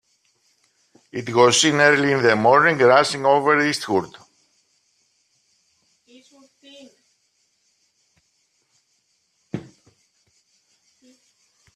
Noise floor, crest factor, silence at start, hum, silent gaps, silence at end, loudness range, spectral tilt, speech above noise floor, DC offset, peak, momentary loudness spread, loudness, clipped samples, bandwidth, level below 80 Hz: -68 dBFS; 22 dB; 1.15 s; none; none; 2.15 s; 10 LU; -3.5 dB/octave; 51 dB; under 0.1%; 0 dBFS; 21 LU; -17 LUFS; under 0.1%; 14 kHz; -66 dBFS